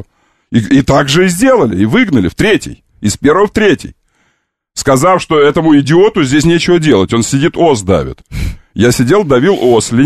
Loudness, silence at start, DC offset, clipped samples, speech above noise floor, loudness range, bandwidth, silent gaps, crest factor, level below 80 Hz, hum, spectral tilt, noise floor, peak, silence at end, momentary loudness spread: -10 LUFS; 0 s; 0.5%; under 0.1%; 52 dB; 3 LU; 14 kHz; none; 10 dB; -32 dBFS; none; -5.5 dB/octave; -62 dBFS; 0 dBFS; 0 s; 9 LU